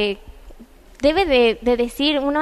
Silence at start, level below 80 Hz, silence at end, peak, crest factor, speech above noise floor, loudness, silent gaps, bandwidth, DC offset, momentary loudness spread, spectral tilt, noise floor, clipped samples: 0 s; -40 dBFS; 0 s; -4 dBFS; 14 dB; 26 dB; -18 LUFS; none; 13.5 kHz; under 0.1%; 7 LU; -4.5 dB/octave; -44 dBFS; under 0.1%